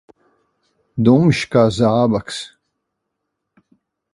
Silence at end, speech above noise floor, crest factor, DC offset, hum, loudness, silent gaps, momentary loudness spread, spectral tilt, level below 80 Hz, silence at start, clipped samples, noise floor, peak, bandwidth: 1.65 s; 62 dB; 18 dB; under 0.1%; none; -15 LUFS; none; 16 LU; -7 dB/octave; -50 dBFS; 0.95 s; under 0.1%; -77 dBFS; 0 dBFS; 11.5 kHz